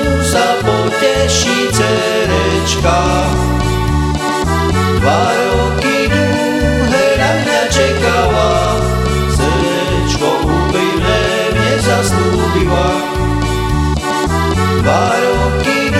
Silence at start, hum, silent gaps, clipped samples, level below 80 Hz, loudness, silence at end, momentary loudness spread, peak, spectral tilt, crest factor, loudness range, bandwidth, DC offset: 0 s; none; none; under 0.1%; -22 dBFS; -13 LUFS; 0 s; 3 LU; 0 dBFS; -5 dB/octave; 12 dB; 1 LU; 16 kHz; 0.2%